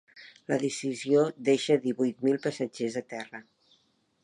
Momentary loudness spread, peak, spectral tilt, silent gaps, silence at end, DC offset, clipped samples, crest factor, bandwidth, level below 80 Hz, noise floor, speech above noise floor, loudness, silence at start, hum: 15 LU; -12 dBFS; -5 dB/octave; none; 0.8 s; under 0.1%; under 0.1%; 18 dB; 11.5 kHz; -80 dBFS; -69 dBFS; 41 dB; -28 LUFS; 0.15 s; none